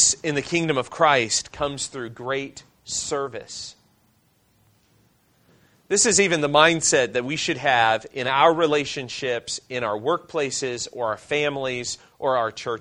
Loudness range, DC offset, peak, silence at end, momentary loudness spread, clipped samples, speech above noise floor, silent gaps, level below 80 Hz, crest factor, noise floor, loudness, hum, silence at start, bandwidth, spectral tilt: 12 LU; under 0.1%; 0 dBFS; 0 s; 12 LU; under 0.1%; 40 dB; none; -58 dBFS; 22 dB; -63 dBFS; -22 LUFS; none; 0 s; 11 kHz; -2.5 dB/octave